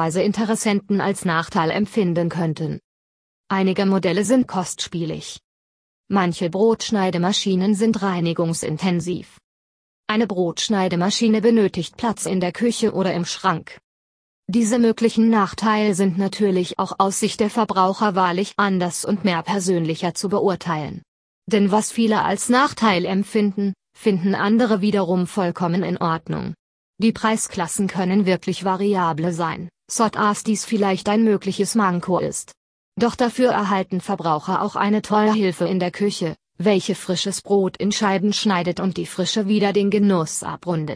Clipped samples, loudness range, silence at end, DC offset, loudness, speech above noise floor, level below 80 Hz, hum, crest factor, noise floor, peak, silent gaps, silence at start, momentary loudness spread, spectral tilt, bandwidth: under 0.1%; 3 LU; 0 s; under 0.1%; -20 LUFS; over 70 dB; -58 dBFS; none; 18 dB; under -90 dBFS; -2 dBFS; 2.84-3.44 s, 5.44-6.04 s, 9.44-10.04 s, 13.84-14.43 s, 21.08-21.42 s, 26.59-26.93 s, 32.57-32.92 s; 0 s; 7 LU; -5 dB/octave; 11 kHz